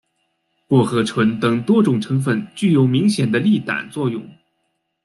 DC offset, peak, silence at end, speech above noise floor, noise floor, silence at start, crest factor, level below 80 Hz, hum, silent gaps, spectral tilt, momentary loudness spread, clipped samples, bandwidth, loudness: under 0.1%; -4 dBFS; 0.75 s; 54 dB; -71 dBFS; 0.7 s; 16 dB; -58 dBFS; none; none; -7 dB/octave; 8 LU; under 0.1%; 12 kHz; -18 LUFS